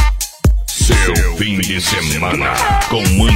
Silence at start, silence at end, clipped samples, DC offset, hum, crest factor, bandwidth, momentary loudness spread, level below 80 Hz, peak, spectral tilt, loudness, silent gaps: 0 s; 0 s; under 0.1%; under 0.1%; none; 14 dB; 16.5 kHz; 4 LU; -18 dBFS; 0 dBFS; -4 dB/octave; -14 LUFS; none